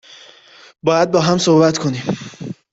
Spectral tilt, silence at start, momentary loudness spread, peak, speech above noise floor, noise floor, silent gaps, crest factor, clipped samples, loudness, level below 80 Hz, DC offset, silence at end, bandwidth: -5.5 dB/octave; 0.85 s; 15 LU; -2 dBFS; 30 dB; -45 dBFS; none; 16 dB; under 0.1%; -16 LUFS; -54 dBFS; under 0.1%; 0.2 s; 8 kHz